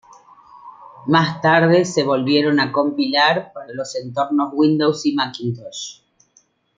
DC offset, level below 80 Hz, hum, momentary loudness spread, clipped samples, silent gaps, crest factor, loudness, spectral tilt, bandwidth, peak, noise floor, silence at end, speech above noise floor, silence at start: under 0.1%; -64 dBFS; none; 14 LU; under 0.1%; none; 18 dB; -18 LUFS; -5 dB/octave; 8.8 kHz; -2 dBFS; -59 dBFS; 0.85 s; 41 dB; 0.65 s